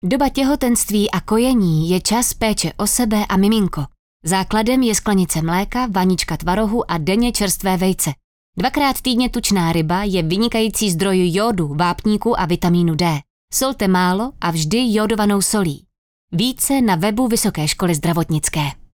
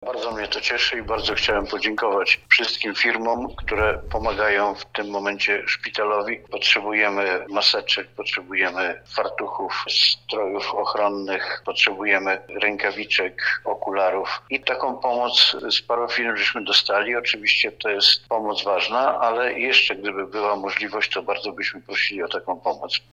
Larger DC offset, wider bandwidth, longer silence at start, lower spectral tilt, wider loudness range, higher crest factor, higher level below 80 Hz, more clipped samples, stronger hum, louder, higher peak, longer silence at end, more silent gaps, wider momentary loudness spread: neither; first, over 20 kHz vs 14.5 kHz; about the same, 0.05 s vs 0 s; first, -4.5 dB/octave vs -2.5 dB/octave; about the same, 1 LU vs 3 LU; second, 12 dB vs 22 dB; first, -36 dBFS vs -46 dBFS; neither; neither; first, -17 LUFS vs -21 LUFS; second, -6 dBFS vs 0 dBFS; about the same, 0.2 s vs 0.15 s; first, 3.99-4.20 s, 8.24-8.53 s, 13.30-13.48 s, 15.98-16.28 s vs none; second, 5 LU vs 10 LU